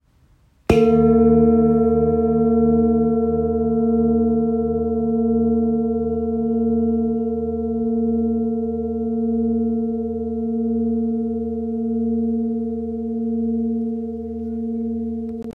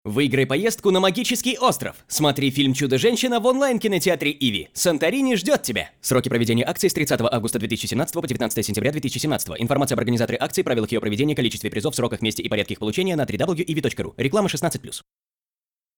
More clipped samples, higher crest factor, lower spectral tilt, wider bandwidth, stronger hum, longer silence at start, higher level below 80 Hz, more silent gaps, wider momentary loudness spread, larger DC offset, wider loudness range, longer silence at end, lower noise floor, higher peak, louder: neither; about the same, 18 dB vs 16 dB; first, -9.5 dB/octave vs -4.5 dB/octave; second, 5.8 kHz vs over 20 kHz; neither; first, 0.7 s vs 0.05 s; first, -40 dBFS vs -54 dBFS; neither; first, 10 LU vs 5 LU; neither; first, 7 LU vs 3 LU; second, 0 s vs 1 s; second, -56 dBFS vs under -90 dBFS; first, -2 dBFS vs -6 dBFS; about the same, -20 LUFS vs -22 LUFS